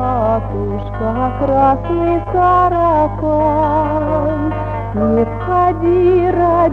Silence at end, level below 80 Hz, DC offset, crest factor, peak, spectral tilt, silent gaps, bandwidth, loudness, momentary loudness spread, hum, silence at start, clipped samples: 0 s; -28 dBFS; under 0.1%; 12 dB; -2 dBFS; -10 dB/octave; none; 5 kHz; -15 LUFS; 8 LU; 50 Hz at -30 dBFS; 0 s; under 0.1%